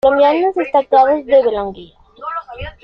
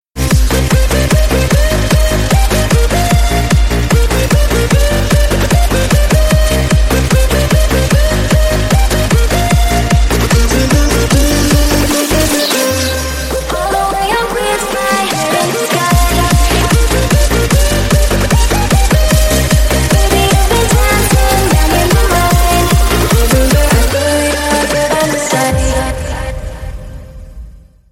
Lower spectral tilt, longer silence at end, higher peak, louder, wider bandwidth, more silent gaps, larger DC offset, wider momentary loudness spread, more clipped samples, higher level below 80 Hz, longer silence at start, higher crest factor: first, -7 dB/octave vs -4.5 dB/octave; second, 0.15 s vs 0.35 s; about the same, -2 dBFS vs 0 dBFS; about the same, -13 LUFS vs -11 LUFS; second, 5.8 kHz vs 16.5 kHz; neither; neither; first, 15 LU vs 4 LU; neither; second, -44 dBFS vs -14 dBFS; about the same, 0.05 s vs 0.15 s; about the same, 12 dB vs 10 dB